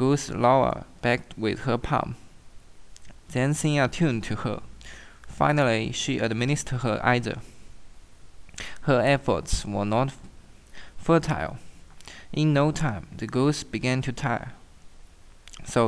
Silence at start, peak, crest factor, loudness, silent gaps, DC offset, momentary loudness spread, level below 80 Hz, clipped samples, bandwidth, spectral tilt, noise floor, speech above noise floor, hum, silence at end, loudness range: 0 s; -6 dBFS; 20 dB; -25 LUFS; none; under 0.1%; 17 LU; -44 dBFS; under 0.1%; 11 kHz; -5.5 dB/octave; -48 dBFS; 23 dB; none; 0 s; 2 LU